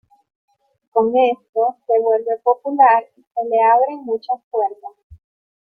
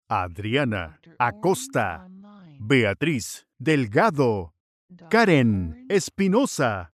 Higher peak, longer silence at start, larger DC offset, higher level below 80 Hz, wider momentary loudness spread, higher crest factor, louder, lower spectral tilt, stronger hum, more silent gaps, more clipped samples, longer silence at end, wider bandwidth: first, -2 dBFS vs -6 dBFS; first, 0.95 s vs 0.1 s; neither; second, -62 dBFS vs -56 dBFS; about the same, 11 LU vs 11 LU; about the same, 16 dB vs 18 dB; first, -17 LUFS vs -23 LUFS; first, -7.5 dB/octave vs -5.5 dB/octave; neither; second, 1.49-1.53 s, 3.27-3.31 s, 4.44-4.51 s, 5.03-5.10 s vs 4.60-4.89 s; neither; first, 0.6 s vs 0.1 s; second, 4.7 kHz vs 14 kHz